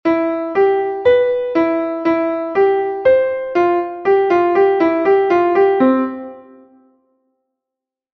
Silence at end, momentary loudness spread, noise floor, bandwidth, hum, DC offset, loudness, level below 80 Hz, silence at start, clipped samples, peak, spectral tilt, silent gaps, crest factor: 1.75 s; 5 LU; -84 dBFS; 6.2 kHz; none; under 0.1%; -15 LUFS; -56 dBFS; 0.05 s; under 0.1%; -2 dBFS; -7 dB/octave; none; 14 dB